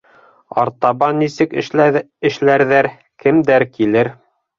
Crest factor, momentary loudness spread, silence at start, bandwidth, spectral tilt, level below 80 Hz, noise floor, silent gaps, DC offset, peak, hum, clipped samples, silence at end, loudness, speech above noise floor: 14 dB; 7 LU; 0.55 s; 7.4 kHz; -7 dB/octave; -56 dBFS; -39 dBFS; none; under 0.1%; -2 dBFS; none; under 0.1%; 0.45 s; -15 LUFS; 25 dB